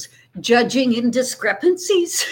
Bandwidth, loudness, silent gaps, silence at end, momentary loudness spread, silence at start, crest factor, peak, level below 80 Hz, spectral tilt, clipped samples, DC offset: 17 kHz; -18 LUFS; none; 0 s; 5 LU; 0 s; 16 dB; -2 dBFS; -64 dBFS; -3 dB/octave; under 0.1%; under 0.1%